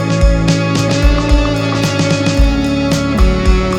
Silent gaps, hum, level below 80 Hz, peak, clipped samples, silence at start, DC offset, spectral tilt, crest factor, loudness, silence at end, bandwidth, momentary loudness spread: none; none; -16 dBFS; 0 dBFS; under 0.1%; 0 s; under 0.1%; -5.5 dB/octave; 12 dB; -13 LUFS; 0 s; 12.5 kHz; 2 LU